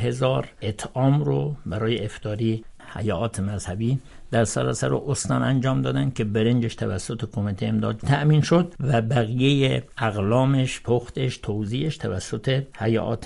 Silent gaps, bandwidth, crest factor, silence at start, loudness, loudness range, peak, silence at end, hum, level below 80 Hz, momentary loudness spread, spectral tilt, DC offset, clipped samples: none; 11.5 kHz; 18 dB; 0 s; -24 LUFS; 4 LU; -6 dBFS; 0 s; none; -46 dBFS; 9 LU; -6 dB/octave; under 0.1%; under 0.1%